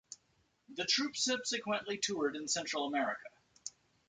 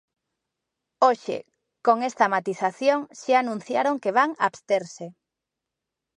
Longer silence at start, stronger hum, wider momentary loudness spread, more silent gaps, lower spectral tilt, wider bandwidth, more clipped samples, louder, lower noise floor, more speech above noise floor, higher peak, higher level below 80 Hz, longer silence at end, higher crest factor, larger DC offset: second, 0.1 s vs 1 s; neither; first, 16 LU vs 11 LU; neither; second, -1.5 dB/octave vs -4.5 dB/octave; about the same, 10 kHz vs 10.5 kHz; neither; second, -35 LUFS vs -24 LUFS; second, -75 dBFS vs -86 dBFS; second, 39 dB vs 62 dB; second, -18 dBFS vs -4 dBFS; about the same, -78 dBFS vs -80 dBFS; second, 0.4 s vs 1.05 s; about the same, 20 dB vs 20 dB; neither